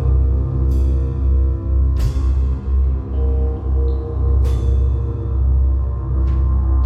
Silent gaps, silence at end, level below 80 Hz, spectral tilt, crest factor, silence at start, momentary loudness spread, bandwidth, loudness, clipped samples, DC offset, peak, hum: none; 0 s; -16 dBFS; -9.5 dB/octave; 10 dB; 0 s; 3 LU; 1.9 kHz; -19 LUFS; under 0.1%; under 0.1%; -6 dBFS; none